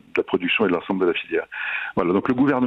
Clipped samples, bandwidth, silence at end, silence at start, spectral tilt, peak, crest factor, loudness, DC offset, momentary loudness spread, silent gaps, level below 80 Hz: under 0.1%; 5.4 kHz; 0 s; 0.15 s; -7.5 dB/octave; -8 dBFS; 14 dB; -22 LUFS; under 0.1%; 6 LU; none; -56 dBFS